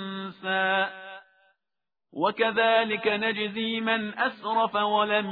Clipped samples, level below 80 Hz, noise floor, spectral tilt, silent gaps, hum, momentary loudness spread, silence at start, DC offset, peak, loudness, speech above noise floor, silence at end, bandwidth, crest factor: under 0.1%; -74 dBFS; under -90 dBFS; -7 dB/octave; none; none; 11 LU; 0 s; under 0.1%; -8 dBFS; -26 LUFS; over 65 dB; 0 s; 4.9 kHz; 18 dB